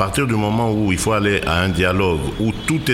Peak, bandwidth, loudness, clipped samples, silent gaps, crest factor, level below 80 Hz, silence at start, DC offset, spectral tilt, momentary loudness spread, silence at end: -4 dBFS; 16 kHz; -18 LUFS; under 0.1%; none; 14 dB; -34 dBFS; 0 s; under 0.1%; -5 dB/octave; 4 LU; 0 s